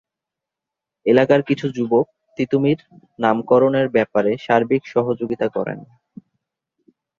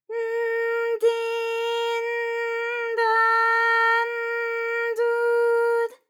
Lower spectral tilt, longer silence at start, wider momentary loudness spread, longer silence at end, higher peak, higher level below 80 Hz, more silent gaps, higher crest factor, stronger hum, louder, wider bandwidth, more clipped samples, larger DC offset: first, -8 dB/octave vs 2 dB/octave; first, 1.05 s vs 0.1 s; first, 10 LU vs 7 LU; first, 1.35 s vs 0.15 s; first, 0 dBFS vs -10 dBFS; first, -62 dBFS vs under -90 dBFS; neither; first, 20 dB vs 14 dB; neither; first, -19 LUFS vs -23 LUFS; second, 7.2 kHz vs 16.5 kHz; neither; neither